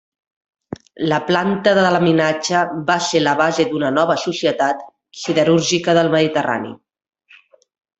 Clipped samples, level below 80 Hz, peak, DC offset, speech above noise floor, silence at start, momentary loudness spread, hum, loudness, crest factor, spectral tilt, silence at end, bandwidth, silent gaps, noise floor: under 0.1%; -60 dBFS; -2 dBFS; under 0.1%; 34 dB; 0.7 s; 12 LU; none; -17 LUFS; 16 dB; -4.5 dB/octave; 1.25 s; 8.4 kHz; none; -50 dBFS